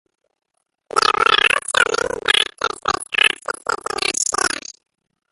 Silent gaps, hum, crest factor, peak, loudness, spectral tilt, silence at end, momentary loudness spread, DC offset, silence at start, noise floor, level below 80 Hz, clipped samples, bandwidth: none; none; 20 dB; 0 dBFS; -17 LUFS; 0.5 dB/octave; 0.75 s; 10 LU; under 0.1%; 0.95 s; -45 dBFS; -54 dBFS; under 0.1%; 12 kHz